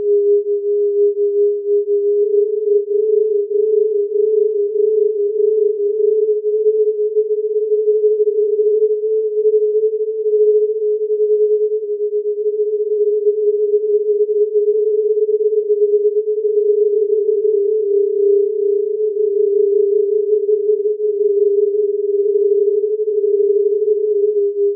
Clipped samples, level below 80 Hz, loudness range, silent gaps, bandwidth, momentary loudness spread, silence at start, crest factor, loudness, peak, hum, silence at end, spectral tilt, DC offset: under 0.1%; under -90 dBFS; 1 LU; none; 0.6 kHz; 3 LU; 0 s; 10 dB; -16 LUFS; -6 dBFS; none; 0 s; -1.5 dB/octave; under 0.1%